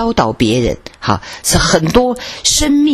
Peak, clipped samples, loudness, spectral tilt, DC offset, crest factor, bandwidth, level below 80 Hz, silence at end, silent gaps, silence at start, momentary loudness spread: 0 dBFS; 0.1%; -13 LUFS; -4 dB/octave; under 0.1%; 14 dB; 14 kHz; -28 dBFS; 0 s; none; 0 s; 7 LU